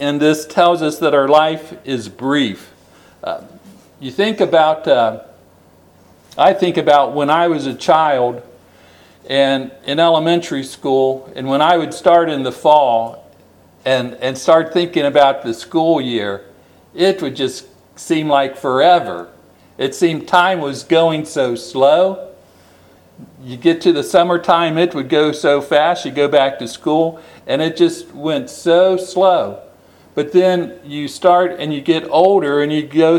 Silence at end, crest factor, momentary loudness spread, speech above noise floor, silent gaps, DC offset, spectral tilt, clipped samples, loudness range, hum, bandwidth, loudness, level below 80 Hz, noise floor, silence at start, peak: 0 s; 16 dB; 13 LU; 34 dB; none; under 0.1%; -5 dB/octave; under 0.1%; 3 LU; none; 18.5 kHz; -15 LUFS; -62 dBFS; -48 dBFS; 0 s; 0 dBFS